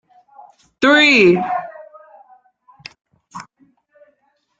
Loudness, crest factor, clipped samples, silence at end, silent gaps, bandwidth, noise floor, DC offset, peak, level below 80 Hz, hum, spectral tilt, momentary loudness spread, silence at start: -13 LUFS; 18 dB; under 0.1%; 1.2 s; none; 7.8 kHz; -65 dBFS; under 0.1%; 0 dBFS; -62 dBFS; none; -4.5 dB/octave; 27 LU; 0.8 s